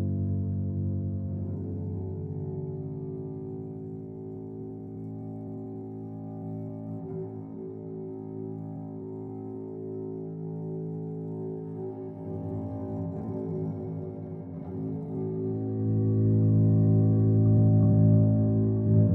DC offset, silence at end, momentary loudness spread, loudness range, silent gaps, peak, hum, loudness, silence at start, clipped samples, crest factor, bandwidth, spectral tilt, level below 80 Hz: under 0.1%; 0 s; 17 LU; 15 LU; none; -12 dBFS; none; -30 LUFS; 0 s; under 0.1%; 16 dB; 1.7 kHz; -14.5 dB/octave; -56 dBFS